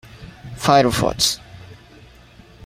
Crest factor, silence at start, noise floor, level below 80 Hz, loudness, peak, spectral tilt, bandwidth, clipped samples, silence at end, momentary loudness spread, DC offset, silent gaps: 20 dB; 0.2 s; -46 dBFS; -44 dBFS; -18 LUFS; -2 dBFS; -3.5 dB/octave; 16 kHz; under 0.1%; 0.95 s; 21 LU; under 0.1%; none